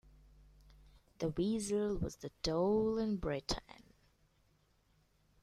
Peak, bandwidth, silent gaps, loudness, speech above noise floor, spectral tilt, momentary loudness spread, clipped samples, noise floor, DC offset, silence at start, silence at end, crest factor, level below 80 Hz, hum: -20 dBFS; 13.5 kHz; none; -37 LUFS; 37 dB; -5.5 dB/octave; 9 LU; under 0.1%; -73 dBFS; under 0.1%; 1.2 s; 1.8 s; 18 dB; -54 dBFS; 50 Hz at -65 dBFS